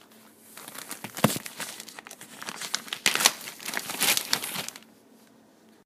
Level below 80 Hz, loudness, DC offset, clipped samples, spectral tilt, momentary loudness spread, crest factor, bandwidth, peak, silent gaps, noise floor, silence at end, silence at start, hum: -70 dBFS; -27 LUFS; under 0.1%; under 0.1%; -1.5 dB/octave; 20 LU; 32 dB; 16 kHz; 0 dBFS; none; -57 dBFS; 1 s; 0.1 s; none